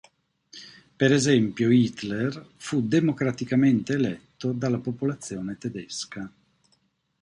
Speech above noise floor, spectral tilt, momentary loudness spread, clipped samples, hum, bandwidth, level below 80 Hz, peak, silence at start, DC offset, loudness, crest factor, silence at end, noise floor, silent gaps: 45 dB; -6 dB/octave; 15 LU; under 0.1%; none; 11 kHz; -62 dBFS; -8 dBFS; 0.55 s; under 0.1%; -25 LUFS; 18 dB; 0.95 s; -69 dBFS; none